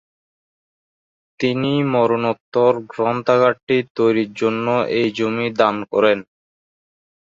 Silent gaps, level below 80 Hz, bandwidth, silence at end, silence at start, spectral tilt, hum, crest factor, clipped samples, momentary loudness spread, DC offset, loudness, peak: 2.40-2.52 s, 3.63-3.67 s, 3.90-3.95 s; -62 dBFS; 7.6 kHz; 1.2 s; 1.4 s; -7 dB/octave; none; 18 dB; under 0.1%; 5 LU; under 0.1%; -18 LUFS; 0 dBFS